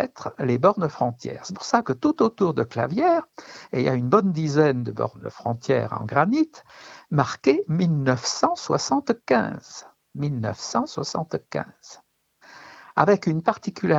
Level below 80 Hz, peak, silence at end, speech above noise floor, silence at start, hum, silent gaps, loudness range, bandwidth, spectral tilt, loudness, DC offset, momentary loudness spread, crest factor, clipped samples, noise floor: -62 dBFS; 0 dBFS; 0 s; 31 dB; 0 s; none; none; 5 LU; 8 kHz; -6 dB/octave; -23 LUFS; under 0.1%; 12 LU; 22 dB; under 0.1%; -54 dBFS